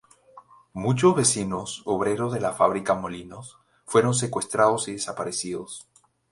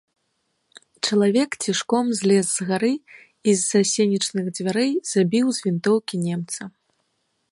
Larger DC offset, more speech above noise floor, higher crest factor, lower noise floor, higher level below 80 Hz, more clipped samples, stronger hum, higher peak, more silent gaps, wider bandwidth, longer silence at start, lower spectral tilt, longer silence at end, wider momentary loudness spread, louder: neither; second, 28 dB vs 51 dB; about the same, 20 dB vs 16 dB; second, -52 dBFS vs -72 dBFS; first, -58 dBFS vs -70 dBFS; neither; neither; about the same, -4 dBFS vs -6 dBFS; neither; about the same, 11.5 kHz vs 11.5 kHz; second, 0.35 s vs 1.05 s; about the same, -4.5 dB/octave vs -4.5 dB/octave; second, 0.5 s vs 0.8 s; first, 17 LU vs 8 LU; second, -24 LUFS vs -21 LUFS